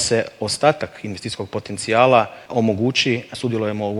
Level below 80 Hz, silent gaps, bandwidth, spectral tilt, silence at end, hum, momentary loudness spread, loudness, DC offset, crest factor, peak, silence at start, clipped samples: -58 dBFS; none; 12.5 kHz; -4.5 dB/octave; 0 s; none; 13 LU; -20 LUFS; under 0.1%; 20 dB; 0 dBFS; 0 s; under 0.1%